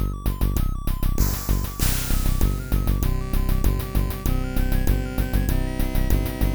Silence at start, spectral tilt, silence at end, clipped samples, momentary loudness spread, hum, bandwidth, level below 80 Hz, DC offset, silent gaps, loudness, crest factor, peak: 0 s; -5.5 dB/octave; 0 s; under 0.1%; 3 LU; none; over 20 kHz; -22 dBFS; under 0.1%; none; -25 LUFS; 16 dB; -6 dBFS